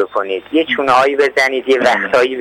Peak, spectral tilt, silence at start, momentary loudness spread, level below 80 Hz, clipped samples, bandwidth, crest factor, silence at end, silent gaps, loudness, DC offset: -2 dBFS; -3.5 dB/octave; 0 s; 6 LU; -56 dBFS; under 0.1%; 16.5 kHz; 10 dB; 0 s; none; -13 LUFS; under 0.1%